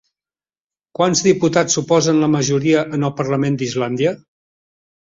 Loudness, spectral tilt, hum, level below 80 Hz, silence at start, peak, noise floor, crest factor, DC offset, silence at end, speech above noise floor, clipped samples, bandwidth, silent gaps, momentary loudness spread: -17 LUFS; -5 dB/octave; none; -56 dBFS; 1 s; -2 dBFS; under -90 dBFS; 16 dB; under 0.1%; 0.9 s; over 74 dB; under 0.1%; 7.8 kHz; none; 6 LU